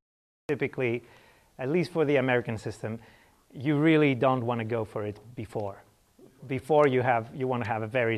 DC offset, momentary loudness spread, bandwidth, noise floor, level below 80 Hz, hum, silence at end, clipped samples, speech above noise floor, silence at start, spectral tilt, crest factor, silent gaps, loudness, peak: under 0.1%; 15 LU; 13 kHz; -58 dBFS; -66 dBFS; none; 0 s; under 0.1%; 31 dB; 0.5 s; -7.5 dB/octave; 20 dB; none; -28 LUFS; -8 dBFS